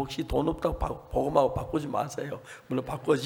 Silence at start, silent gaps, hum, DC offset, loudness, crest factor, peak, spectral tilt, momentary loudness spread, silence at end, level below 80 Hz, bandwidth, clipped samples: 0 s; none; none; under 0.1%; -30 LUFS; 20 dB; -10 dBFS; -6.5 dB/octave; 9 LU; 0 s; -42 dBFS; 18.5 kHz; under 0.1%